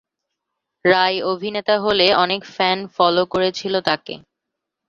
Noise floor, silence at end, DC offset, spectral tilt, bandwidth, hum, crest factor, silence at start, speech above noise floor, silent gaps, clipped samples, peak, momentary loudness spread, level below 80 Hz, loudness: -81 dBFS; 0.7 s; under 0.1%; -4.5 dB/octave; 7.6 kHz; none; 20 dB; 0.85 s; 63 dB; none; under 0.1%; 0 dBFS; 8 LU; -58 dBFS; -18 LUFS